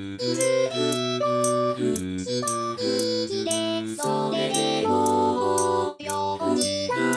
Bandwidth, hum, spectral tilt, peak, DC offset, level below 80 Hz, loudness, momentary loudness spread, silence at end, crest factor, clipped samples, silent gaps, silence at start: 11 kHz; none; -3.5 dB/octave; -8 dBFS; under 0.1%; -68 dBFS; -24 LUFS; 5 LU; 0 s; 16 dB; under 0.1%; none; 0 s